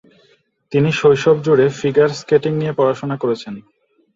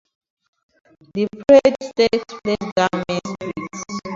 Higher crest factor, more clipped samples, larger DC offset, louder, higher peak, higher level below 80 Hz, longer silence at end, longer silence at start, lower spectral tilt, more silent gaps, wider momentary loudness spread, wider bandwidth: about the same, 16 dB vs 20 dB; neither; neither; first, -16 LUFS vs -19 LUFS; about the same, -2 dBFS vs 0 dBFS; about the same, -56 dBFS vs -54 dBFS; first, 0.55 s vs 0 s; second, 0.7 s vs 1.15 s; first, -6.5 dB/octave vs -5 dB/octave; second, none vs 2.72-2.76 s; second, 8 LU vs 16 LU; about the same, 7.8 kHz vs 7.8 kHz